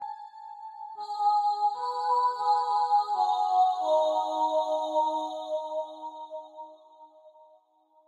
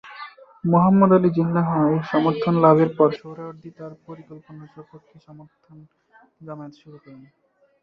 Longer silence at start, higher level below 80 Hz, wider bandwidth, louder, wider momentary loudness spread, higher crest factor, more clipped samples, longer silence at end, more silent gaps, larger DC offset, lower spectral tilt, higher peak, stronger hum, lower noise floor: about the same, 0 s vs 0.05 s; second, under -90 dBFS vs -62 dBFS; first, 10.5 kHz vs 5.8 kHz; second, -27 LUFS vs -18 LUFS; second, 18 LU vs 26 LU; second, 14 dB vs 20 dB; neither; about the same, 0.8 s vs 0.7 s; neither; neither; second, -1 dB/octave vs -10.5 dB/octave; second, -14 dBFS vs -2 dBFS; neither; first, -64 dBFS vs -41 dBFS